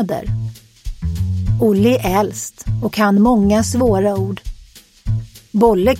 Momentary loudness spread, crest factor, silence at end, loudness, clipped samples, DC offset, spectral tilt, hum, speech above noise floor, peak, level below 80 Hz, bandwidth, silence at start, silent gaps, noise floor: 16 LU; 16 dB; 0 s; -17 LUFS; under 0.1%; under 0.1%; -6.5 dB/octave; none; 28 dB; 0 dBFS; -30 dBFS; 16.5 kHz; 0 s; none; -43 dBFS